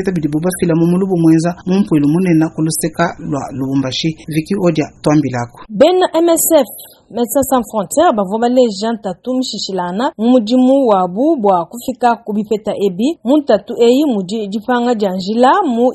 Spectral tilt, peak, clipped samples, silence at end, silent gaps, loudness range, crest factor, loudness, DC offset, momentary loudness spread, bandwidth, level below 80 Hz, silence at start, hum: -5.5 dB/octave; 0 dBFS; under 0.1%; 0 s; none; 2 LU; 14 dB; -14 LUFS; under 0.1%; 9 LU; 12.5 kHz; -48 dBFS; 0 s; none